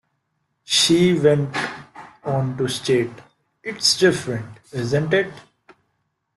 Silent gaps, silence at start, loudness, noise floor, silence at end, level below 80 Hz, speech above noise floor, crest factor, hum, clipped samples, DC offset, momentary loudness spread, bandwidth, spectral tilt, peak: none; 0.7 s; -20 LUFS; -72 dBFS; 0.95 s; -58 dBFS; 53 dB; 18 dB; none; under 0.1%; under 0.1%; 16 LU; 12.5 kHz; -4 dB/octave; -4 dBFS